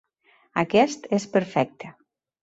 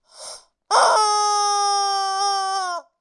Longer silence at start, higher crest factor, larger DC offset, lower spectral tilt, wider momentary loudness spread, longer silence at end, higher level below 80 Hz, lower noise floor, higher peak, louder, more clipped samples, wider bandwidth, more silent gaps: first, 0.55 s vs 0.15 s; about the same, 20 dB vs 16 dB; neither; first, -5.5 dB/octave vs 2.5 dB/octave; about the same, 15 LU vs 16 LU; first, 0.5 s vs 0.2 s; first, -66 dBFS vs -78 dBFS; first, -62 dBFS vs -40 dBFS; about the same, -6 dBFS vs -4 dBFS; second, -24 LUFS vs -19 LUFS; neither; second, 8 kHz vs 11.5 kHz; neither